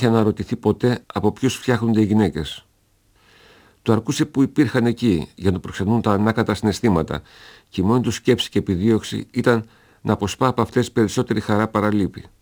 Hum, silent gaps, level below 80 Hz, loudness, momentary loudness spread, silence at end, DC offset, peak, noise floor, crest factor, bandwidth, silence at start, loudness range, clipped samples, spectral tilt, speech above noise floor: none; none; -46 dBFS; -20 LUFS; 6 LU; 0.2 s; under 0.1%; -2 dBFS; -60 dBFS; 18 dB; over 20 kHz; 0 s; 2 LU; under 0.1%; -6.5 dB/octave; 41 dB